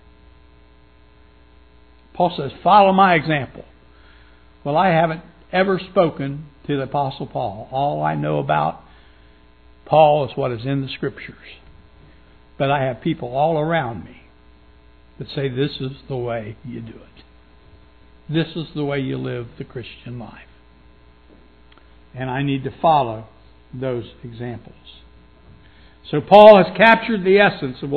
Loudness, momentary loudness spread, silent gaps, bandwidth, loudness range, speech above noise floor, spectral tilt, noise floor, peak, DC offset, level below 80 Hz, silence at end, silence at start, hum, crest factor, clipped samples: -18 LUFS; 21 LU; none; 5.4 kHz; 13 LU; 33 dB; -9 dB/octave; -51 dBFS; 0 dBFS; 0.2%; -50 dBFS; 0 s; 2.2 s; none; 20 dB; under 0.1%